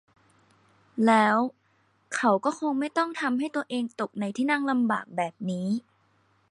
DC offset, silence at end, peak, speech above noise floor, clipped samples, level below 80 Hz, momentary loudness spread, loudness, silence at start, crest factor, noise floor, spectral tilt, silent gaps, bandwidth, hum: under 0.1%; 0.7 s; -8 dBFS; 41 dB; under 0.1%; -78 dBFS; 10 LU; -27 LUFS; 0.95 s; 20 dB; -67 dBFS; -5.5 dB/octave; none; 11.5 kHz; none